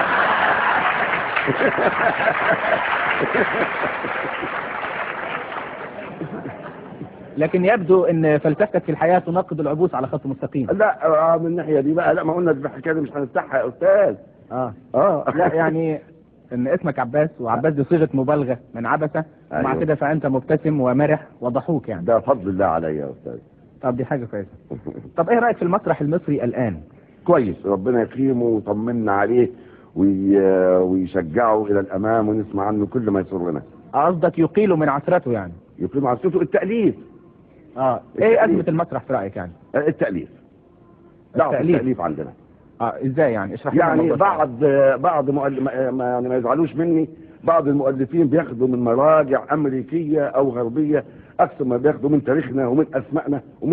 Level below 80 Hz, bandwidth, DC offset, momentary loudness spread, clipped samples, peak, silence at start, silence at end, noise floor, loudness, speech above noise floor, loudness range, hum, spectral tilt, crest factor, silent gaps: -54 dBFS; 4.7 kHz; under 0.1%; 11 LU; under 0.1%; -2 dBFS; 0 s; 0 s; -50 dBFS; -20 LUFS; 31 dB; 4 LU; none; -11.5 dB/octave; 18 dB; none